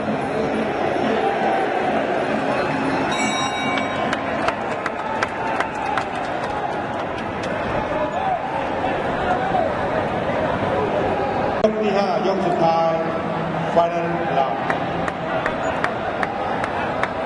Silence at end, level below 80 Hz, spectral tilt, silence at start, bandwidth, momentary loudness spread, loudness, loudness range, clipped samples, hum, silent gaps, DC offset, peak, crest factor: 0 s; -46 dBFS; -5.5 dB/octave; 0 s; 11.5 kHz; 5 LU; -21 LUFS; 4 LU; under 0.1%; none; none; under 0.1%; -2 dBFS; 18 dB